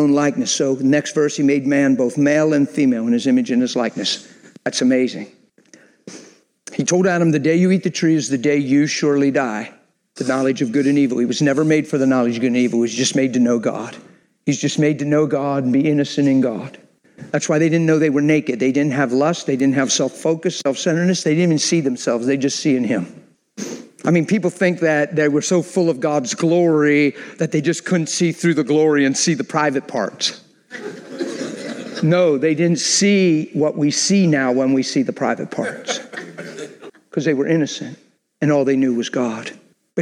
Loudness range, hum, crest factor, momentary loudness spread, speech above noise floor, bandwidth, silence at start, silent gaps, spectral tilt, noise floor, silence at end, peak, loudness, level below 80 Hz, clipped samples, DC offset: 4 LU; none; 14 dB; 12 LU; 33 dB; 11 kHz; 0 s; none; -5 dB/octave; -50 dBFS; 0 s; -2 dBFS; -18 LUFS; -70 dBFS; under 0.1%; under 0.1%